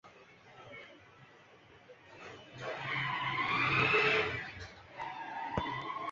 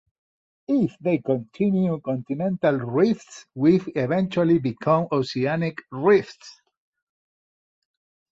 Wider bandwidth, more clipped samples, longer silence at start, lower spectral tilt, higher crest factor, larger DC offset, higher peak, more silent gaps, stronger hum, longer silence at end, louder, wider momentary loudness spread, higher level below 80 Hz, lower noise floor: about the same, 7.6 kHz vs 7.8 kHz; neither; second, 0.05 s vs 0.7 s; second, -2 dB/octave vs -8 dB/octave; about the same, 20 dB vs 18 dB; neither; second, -16 dBFS vs -6 dBFS; neither; neither; second, 0 s vs 1.85 s; second, -33 LUFS vs -23 LUFS; first, 23 LU vs 8 LU; about the same, -62 dBFS vs -64 dBFS; second, -59 dBFS vs under -90 dBFS